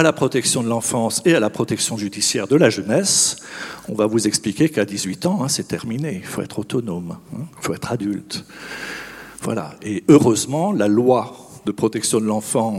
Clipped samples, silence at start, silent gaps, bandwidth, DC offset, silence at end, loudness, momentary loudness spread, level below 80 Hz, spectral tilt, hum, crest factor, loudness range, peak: under 0.1%; 0 s; none; 16.5 kHz; under 0.1%; 0 s; -19 LUFS; 15 LU; -58 dBFS; -4 dB/octave; none; 20 dB; 9 LU; 0 dBFS